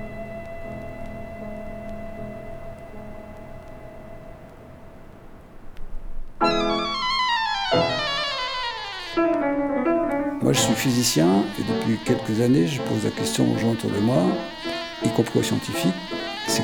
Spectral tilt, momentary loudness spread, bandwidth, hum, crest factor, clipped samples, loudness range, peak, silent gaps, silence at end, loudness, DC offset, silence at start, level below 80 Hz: -4.5 dB/octave; 21 LU; over 20 kHz; none; 20 dB; under 0.1%; 18 LU; -4 dBFS; none; 0 s; -23 LUFS; under 0.1%; 0 s; -42 dBFS